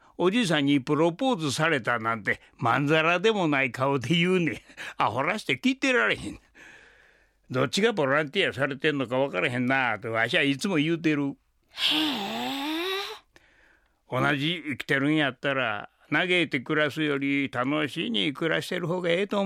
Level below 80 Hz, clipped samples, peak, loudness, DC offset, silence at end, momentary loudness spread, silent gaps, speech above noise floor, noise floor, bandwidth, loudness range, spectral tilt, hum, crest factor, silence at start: -64 dBFS; under 0.1%; -8 dBFS; -25 LUFS; under 0.1%; 0 s; 7 LU; none; 37 dB; -62 dBFS; 15.5 kHz; 4 LU; -5 dB/octave; none; 18 dB; 0.2 s